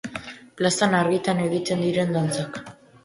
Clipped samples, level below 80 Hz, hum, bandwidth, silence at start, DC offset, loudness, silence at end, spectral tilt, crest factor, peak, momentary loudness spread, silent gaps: under 0.1%; -60 dBFS; none; 11.5 kHz; 0.05 s; under 0.1%; -23 LUFS; 0.35 s; -5 dB/octave; 18 dB; -6 dBFS; 15 LU; none